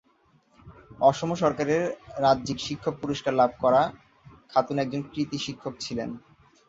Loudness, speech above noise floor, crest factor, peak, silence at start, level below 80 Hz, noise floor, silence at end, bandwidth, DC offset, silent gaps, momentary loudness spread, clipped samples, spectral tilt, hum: -26 LUFS; 38 dB; 20 dB; -6 dBFS; 0.65 s; -58 dBFS; -64 dBFS; 0.5 s; 7.8 kHz; under 0.1%; none; 10 LU; under 0.1%; -5.5 dB/octave; none